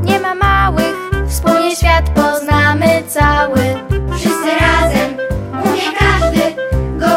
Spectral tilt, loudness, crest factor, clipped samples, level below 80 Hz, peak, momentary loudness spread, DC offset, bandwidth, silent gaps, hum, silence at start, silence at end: -5.5 dB/octave; -13 LUFS; 12 dB; under 0.1%; -22 dBFS; 0 dBFS; 7 LU; under 0.1%; 16.5 kHz; none; none; 0 s; 0 s